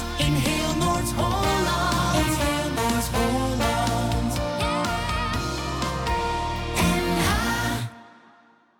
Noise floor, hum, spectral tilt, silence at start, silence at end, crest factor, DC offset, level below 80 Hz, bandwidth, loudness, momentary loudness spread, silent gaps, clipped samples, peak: -56 dBFS; none; -4.5 dB/octave; 0 s; 0.7 s; 12 dB; under 0.1%; -34 dBFS; 19 kHz; -24 LUFS; 5 LU; none; under 0.1%; -12 dBFS